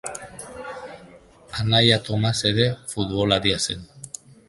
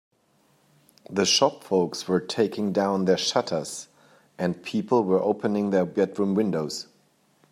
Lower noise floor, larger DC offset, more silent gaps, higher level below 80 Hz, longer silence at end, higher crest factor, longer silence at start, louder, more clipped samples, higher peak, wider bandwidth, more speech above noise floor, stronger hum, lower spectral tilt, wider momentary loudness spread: second, -48 dBFS vs -64 dBFS; neither; neither; first, -48 dBFS vs -72 dBFS; second, 0.4 s vs 0.7 s; about the same, 22 dB vs 20 dB; second, 0.05 s vs 1.1 s; first, -21 LUFS vs -25 LUFS; neither; first, -2 dBFS vs -6 dBFS; second, 11.5 kHz vs 14.5 kHz; second, 27 dB vs 40 dB; neither; about the same, -4.5 dB/octave vs -4.5 dB/octave; first, 20 LU vs 9 LU